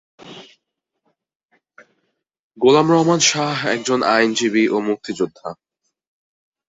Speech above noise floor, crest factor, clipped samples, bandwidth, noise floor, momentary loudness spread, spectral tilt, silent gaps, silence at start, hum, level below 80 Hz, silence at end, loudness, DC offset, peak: 59 dB; 20 dB; under 0.1%; 8 kHz; -76 dBFS; 18 LU; -3.5 dB/octave; 1.35-1.49 s, 2.39-2.50 s; 0.25 s; none; -64 dBFS; 1.15 s; -17 LUFS; under 0.1%; 0 dBFS